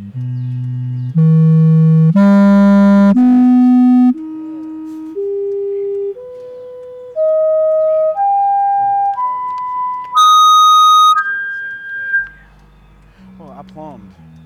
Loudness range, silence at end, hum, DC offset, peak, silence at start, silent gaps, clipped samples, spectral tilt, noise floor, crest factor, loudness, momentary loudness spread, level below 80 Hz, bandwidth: 9 LU; 0.4 s; none; under 0.1%; -6 dBFS; 0 s; none; under 0.1%; -6.5 dB/octave; -44 dBFS; 8 dB; -11 LUFS; 20 LU; -56 dBFS; 14.5 kHz